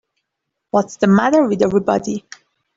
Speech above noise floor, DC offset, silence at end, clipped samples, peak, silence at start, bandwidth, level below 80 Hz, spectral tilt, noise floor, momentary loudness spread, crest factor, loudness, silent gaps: 62 dB; under 0.1%; 0.6 s; under 0.1%; -2 dBFS; 0.75 s; 7.8 kHz; -54 dBFS; -6.5 dB/octave; -78 dBFS; 9 LU; 14 dB; -16 LUFS; none